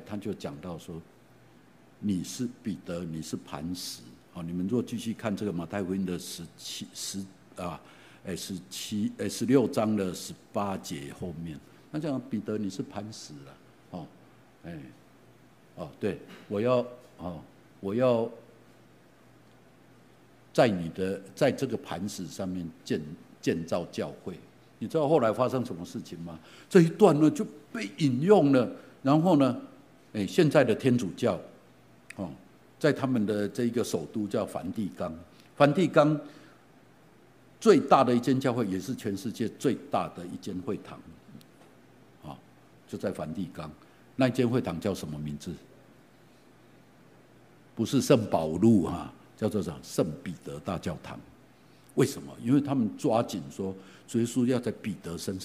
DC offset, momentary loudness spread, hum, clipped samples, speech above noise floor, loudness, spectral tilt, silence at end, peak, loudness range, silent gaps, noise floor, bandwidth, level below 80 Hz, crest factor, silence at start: under 0.1%; 20 LU; none; under 0.1%; 29 dB; -29 LUFS; -6 dB/octave; 0 s; -6 dBFS; 11 LU; none; -58 dBFS; 15.5 kHz; -62 dBFS; 24 dB; 0 s